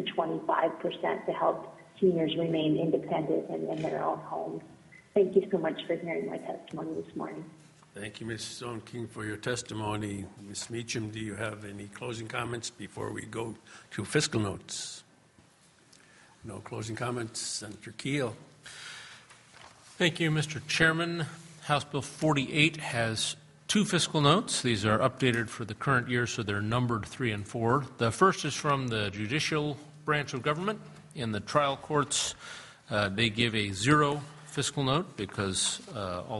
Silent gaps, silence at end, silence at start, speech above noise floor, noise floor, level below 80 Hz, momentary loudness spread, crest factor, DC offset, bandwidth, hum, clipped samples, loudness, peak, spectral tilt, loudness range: none; 0 s; 0 s; 31 dB; -61 dBFS; -62 dBFS; 15 LU; 24 dB; under 0.1%; 11.5 kHz; none; under 0.1%; -30 LUFS; -8 dBFS; -4.5 dB/octave; 9 LU